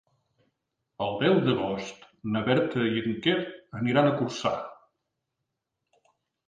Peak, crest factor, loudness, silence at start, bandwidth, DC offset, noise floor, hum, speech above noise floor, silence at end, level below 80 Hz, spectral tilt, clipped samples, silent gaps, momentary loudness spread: -8 dBFS; 20 dB; -27 LUFS; 1 s; 9.4 kHz; under 0.1%; -83 dBFS; none; 57 dB; 1.75 s; -64 dBFS; -6.5 dB/octave; under 0.1%; none; 12 LU